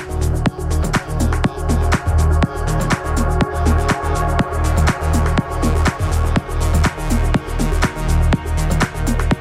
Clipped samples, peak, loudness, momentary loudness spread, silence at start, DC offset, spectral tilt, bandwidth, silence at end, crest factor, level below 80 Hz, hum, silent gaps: under 0.1%; -2 dBFS; -18 LUFS; 3 LU; 0 s; under 0.1%; -6 dB/octave; 15 kHz; 0 s; 16 dB; -20 dBFS; none; none